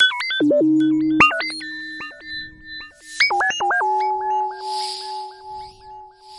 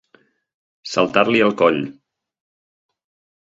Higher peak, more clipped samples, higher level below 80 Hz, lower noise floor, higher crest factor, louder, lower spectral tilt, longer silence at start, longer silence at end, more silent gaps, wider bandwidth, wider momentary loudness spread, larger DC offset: about the same, -2 dBFS vs 0 dBFS; neither; about the same, -56 dBFS vs -60 dBFS; second, -41 dBFS vs -58 dBFS; about the same, 18 dB vs 22 dB; about the same, -19 LUFS vs -17 LUFS; second, -3 dB/octave vs -5 dB/octave; second, 0 s vs 0.85 s; second, 0 s vs 1.5 s; neither; first, 11.5 kHz vs 7.8 kHz; first, 20 LU vs 15 LU; neither